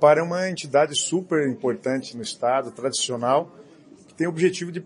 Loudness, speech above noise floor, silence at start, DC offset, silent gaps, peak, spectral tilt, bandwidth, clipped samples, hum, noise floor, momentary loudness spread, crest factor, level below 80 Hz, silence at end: -23 LUFS; 27 dB; 0 s; under 0.1%; none; -4 dBFS; -4 dB/octave; 11 kHz; under 0.1%; none; -50 dBFS; 7 LU; 20 dB; -72 dBFS; 0 s